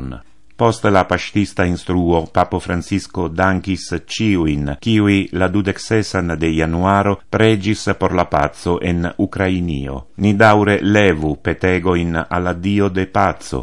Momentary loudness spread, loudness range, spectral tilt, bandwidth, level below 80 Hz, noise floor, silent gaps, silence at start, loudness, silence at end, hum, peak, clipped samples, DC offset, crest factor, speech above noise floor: 7 LU; 3 LU; -6.5 dB/octave; 11.5 kHz; -38 dBFS; -35 dBFS; none; 0 s; -17 LUFS; 0 s; none; 0 dBFS; under 0.1%; 1%; 16 dB; 19 dB